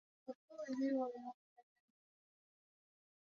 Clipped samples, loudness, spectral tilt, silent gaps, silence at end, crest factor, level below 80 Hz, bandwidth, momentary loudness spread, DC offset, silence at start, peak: under 0.1%; -43 LUFS; -4 dB/octave; 0.35-0.48 s, 1.34-1.56 s; 1.7 s; 18 dB; under -90 dBFS; 7 kHz; 16 LU; under 0.1%; 0.25 s; -30 dBFS